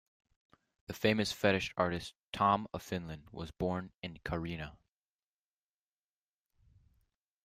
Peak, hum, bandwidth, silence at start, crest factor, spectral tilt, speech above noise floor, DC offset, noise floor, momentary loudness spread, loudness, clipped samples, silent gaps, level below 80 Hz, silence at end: -14 dBFS; none; 15.5 kHz; 0.9 s; 24 dB; -5.5 dB/octave; over 55 dB; under 0.1%; under -90 dBFS; 16 LU; -35 LUFS; under 0.1%; 2.24-2.32 s, 3.94-3.99 s; -60 dBFS; 2.7 s